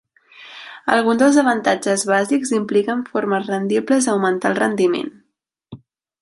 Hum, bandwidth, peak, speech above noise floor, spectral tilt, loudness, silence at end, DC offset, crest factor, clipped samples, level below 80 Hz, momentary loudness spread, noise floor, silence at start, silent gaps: none; 11.5 kHz; 0 dBFS; 54 dB; -4.5 dB/octave; -18 LUFS; 0.45 s; under 0.1%; 18 dB; under 0.1%; -64 dBFS; 11 LU; -71 dBFS; 0.4 s; none